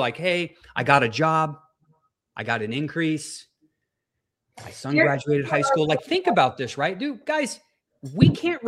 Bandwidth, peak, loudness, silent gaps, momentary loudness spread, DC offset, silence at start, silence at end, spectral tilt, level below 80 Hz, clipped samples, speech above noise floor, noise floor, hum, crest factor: 12.5 kHz; -2 dBFS; -23 LUFS; none; 16 LU; under 0.1%; 0 s; 0 s; -5.5 dB/octave; -54 dBFS; under 0.1%; 59 dB; -81 dBFS; none; 22 dB